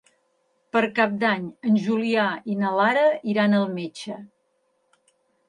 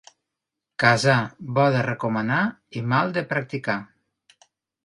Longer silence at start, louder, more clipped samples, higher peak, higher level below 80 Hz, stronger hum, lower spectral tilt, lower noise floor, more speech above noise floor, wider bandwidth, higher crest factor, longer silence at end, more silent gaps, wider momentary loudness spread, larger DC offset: about the same, 0.75 s vs 0.8 s; about the same, -22 LUFS vs -23 LUFS; neither; about the same, -4 dBFS vs -4 dBFS; second, -72 dBFS vs -62 dBFS; neither; about the same, -6.5 dB/octave vs -6 dB/octave; second, -70 dBFS vs -84 dBFS; second, 48 dB vs 62 dB; about the same, 10.5 kHz vs 11.5 kHz; about the same, 20 dB vs 20 dB; first, 1.2 s vs 1 s; neither; first, 12 LU vs 9 LU; neither